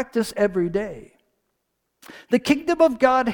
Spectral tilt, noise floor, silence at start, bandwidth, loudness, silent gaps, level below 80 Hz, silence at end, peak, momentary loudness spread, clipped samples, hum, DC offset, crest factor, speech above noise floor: -5.5 dB/octave; -75 dBFS; 0 s; 19 kHz; -21 LUFS; none; -54 dBFS; 0 s; -4 dBFS; 11 LU; under 0.1%; none; under 0.1%; 18 dB; 54 dB